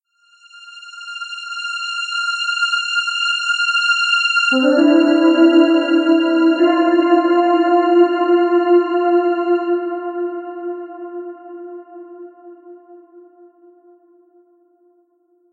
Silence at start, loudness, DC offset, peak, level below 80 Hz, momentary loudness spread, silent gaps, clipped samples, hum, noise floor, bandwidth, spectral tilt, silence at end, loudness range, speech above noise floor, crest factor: 0.55 s; -15 LUFS; under 0.1%; -2 dBFS; -74 dBFS; 18 LU; none; under 0.1%; none; -59 dBFS; 9 kHz; -2 dB/octave; 2.3 s; 16 LU; 47 dB; 16 dB